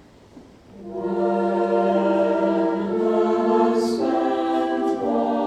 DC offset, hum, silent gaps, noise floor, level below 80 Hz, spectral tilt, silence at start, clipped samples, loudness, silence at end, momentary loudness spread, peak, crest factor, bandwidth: under 0.1%; none; none; -47 dBFS; -58 dBFS; -7 dB/octave; 0.35 s; under 0.1%; -21 LUFS; 0 s; 4 LU; -6 dBFS; 14 dB; 10 kHz